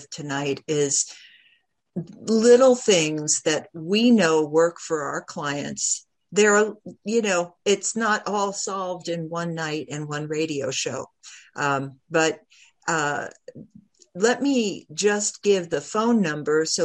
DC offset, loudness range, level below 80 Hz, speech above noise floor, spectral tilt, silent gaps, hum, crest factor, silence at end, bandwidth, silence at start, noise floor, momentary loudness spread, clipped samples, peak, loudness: under 0.1%; 8 LU; -70 dBFS; 41 dB; -3.5 dB/octave; none; none; 18 dB; 0 s; 11 kHz; 0 s; -63 dBFS; 12 LU; under 0.1%; -4 dBFS; -23 LUFS